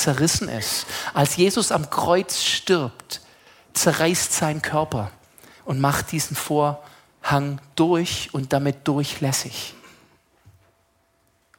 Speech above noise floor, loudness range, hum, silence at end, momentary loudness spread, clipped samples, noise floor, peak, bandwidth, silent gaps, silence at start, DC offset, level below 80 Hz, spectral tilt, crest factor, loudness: 42 dB; 4 LU; none; 1.7 s; 12 LU; under 0.1%; -64 dBFS; -4 dBFS; 17 kHz; none; 0 s; under 0.1%; -54 dBFS; -4 dB/octave; 20 dB; -22 LUFS